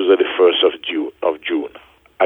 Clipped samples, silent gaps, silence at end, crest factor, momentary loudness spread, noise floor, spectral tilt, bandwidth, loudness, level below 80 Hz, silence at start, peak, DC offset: under 0.1%; none; 0 s; 16 dB; 10 LU; -45 dBFS; -5.5 dB/octave; 3.9 kHz; -17 LUFS; -62 dBFS; 0 s; -2 dBFS; under 0.1%